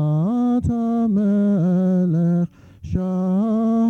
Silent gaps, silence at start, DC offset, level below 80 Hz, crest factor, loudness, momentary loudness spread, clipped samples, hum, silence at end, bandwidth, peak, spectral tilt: none; 0 s; under 0.1%; -44 dBFS; 10 dB; -20 LUFS; 5 LU; under 0.1%; none; 0 s; 6.6 kHz; -8 dBFS; -10.5 dB/octave